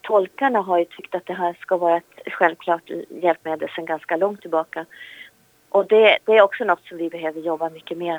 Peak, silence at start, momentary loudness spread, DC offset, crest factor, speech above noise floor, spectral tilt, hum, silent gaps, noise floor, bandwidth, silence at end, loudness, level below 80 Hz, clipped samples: 0 dBFS; 0.05 s; 15 LU; under 0.1%; 20 dB; 30 dB; -5.5 dB/octave; none; none; -51 dBFS; 20 kHz; 0 s; -21 LUFS; -78 dBFS; under 0.1%